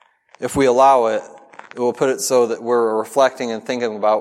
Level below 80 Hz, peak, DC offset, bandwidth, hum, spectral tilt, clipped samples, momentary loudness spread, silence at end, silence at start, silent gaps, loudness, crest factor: -54 dBFS; -2 dBFS; under 0.1%; 15.5 kHz; none; -4 dB/octave; under 0.1%; 12 LU; 0 s; 0.4 s; none; -17 LUFS; 16 dB